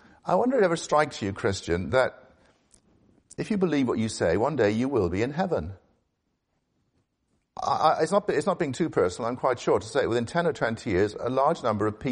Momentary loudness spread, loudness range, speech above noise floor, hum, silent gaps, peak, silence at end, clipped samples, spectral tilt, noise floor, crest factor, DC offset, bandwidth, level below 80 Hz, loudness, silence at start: 6 LU; 3 LU; 51 dB; none; none; -6 dBFS; 0 s; under 0.1%; -6 dB/octave; -76 dBFS; 20 dB; under 0.1%; 10.5 kHz; -54 dBFS; -26 LUFS; 0.25 s